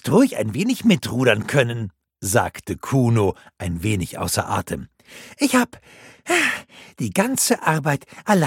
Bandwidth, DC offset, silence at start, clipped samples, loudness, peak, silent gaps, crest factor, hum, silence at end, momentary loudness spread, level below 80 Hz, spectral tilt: 17 kHz; under 0.1%; 0.05 s; under 0.1%; -21 LUFS; 0 dBFS; none; 20 dB; none; 0 s; 13 LU; -50 dBFS; -5 dB/octave